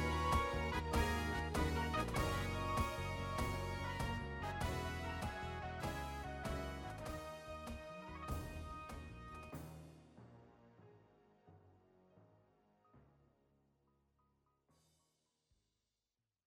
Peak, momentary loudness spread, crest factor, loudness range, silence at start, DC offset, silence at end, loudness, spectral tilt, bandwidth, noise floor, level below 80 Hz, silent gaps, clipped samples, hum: -24 dBFS; 14 LU; 20 dB; 16 LU; 0 s; under 0.1%; 3.45 s; -43 LUFS; -5.5 dB/octave; 16.5 kHz; under -90 dBFS; -50 dBFS; none; under 0.1%; none